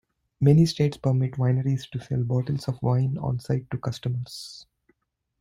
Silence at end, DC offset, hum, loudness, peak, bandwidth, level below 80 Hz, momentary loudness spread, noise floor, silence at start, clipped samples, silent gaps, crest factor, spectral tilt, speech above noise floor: 0.8 s; under 0.1%; none; -25 LUFS; -6 dBFS; 11.5 kHz; -54 dBFS; 12 LU; -73 dBFS; 0.4 s; under 0.1%; none; 18 dB; -7.5 dB/octave; 49 dB